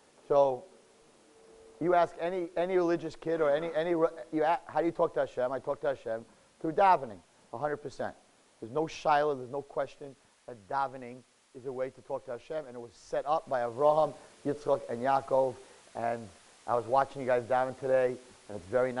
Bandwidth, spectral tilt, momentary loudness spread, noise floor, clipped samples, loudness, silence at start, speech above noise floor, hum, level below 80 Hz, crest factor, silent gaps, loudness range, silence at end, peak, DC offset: 11.5 kHz; -6 dB/octave; 18 LU; -61 dBFS; under 0.1%; -31 LUFS; 0.3 s; 30 dB; none; -66 dBFS; 20 dB; none; 6 LU; 0 s; -12 dBFS; under 0.1%